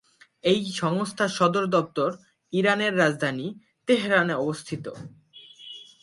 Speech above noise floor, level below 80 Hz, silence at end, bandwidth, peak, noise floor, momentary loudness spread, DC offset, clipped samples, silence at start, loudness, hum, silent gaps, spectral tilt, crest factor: 24 dB; -68 dBFS; 0.2 s; 11.5 kHz; -6 dBFS; -48 dBFS; 20 LU; under 0.1%; under 0.1%; 0.45 s; -24 LUFS; none; none; -5 dB/octave; 20 dB